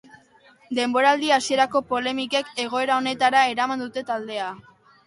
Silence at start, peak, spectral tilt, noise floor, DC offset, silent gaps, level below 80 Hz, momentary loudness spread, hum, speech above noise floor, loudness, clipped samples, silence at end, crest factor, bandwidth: 0.7 s; -6 dBFS; -2.5 dB/octave; -55 dBFS; under 0.1%; none; -68 dBFS; 11 LU; none; 33 dB; -22 LUFS; under 0.1%; 0.45 s; 18 dB; 11.5 kHz